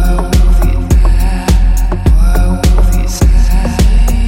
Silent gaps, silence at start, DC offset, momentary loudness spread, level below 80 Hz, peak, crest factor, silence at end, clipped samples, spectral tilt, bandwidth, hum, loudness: none; 0 s; under 0.1%; 2 LU; -8 dBFS; 0 dBFS; 8 dB; 0 s; under 0.1%; -6 dB/octave; 16 kHz; none; -12 LUFS